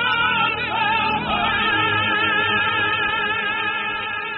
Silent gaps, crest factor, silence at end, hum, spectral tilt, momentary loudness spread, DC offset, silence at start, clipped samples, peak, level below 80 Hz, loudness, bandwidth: none; 14 dB; 0 s; none; 0 dB/octave; 4 LU; under 0.1%; 0 s; under 0.1%; -6 dBFS; -48 dBFS; -19 LUFS; 4.5 kHz